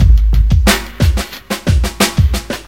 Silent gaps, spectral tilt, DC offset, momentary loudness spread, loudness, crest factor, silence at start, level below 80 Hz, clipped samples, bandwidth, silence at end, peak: none; -5 dB/octave; 0.8%; 8 LU; -14 LUFS; 12 dB; 0 s; -14 dBFS; 0.1%; 16.5 kHz; 0.05 s; 0 dBFS